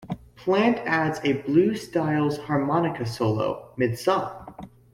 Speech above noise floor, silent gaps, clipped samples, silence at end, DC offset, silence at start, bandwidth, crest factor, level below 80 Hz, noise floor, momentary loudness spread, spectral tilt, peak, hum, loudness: 20 dB; none; under 0.1%; 0.25 s; under 0.1%; 0 s; 16 kHz; 18 dB; -58 dBFS; -43 dBFS; 12 LU; -6.5 dB/octave; -6 dBFS; none; -24 LUFS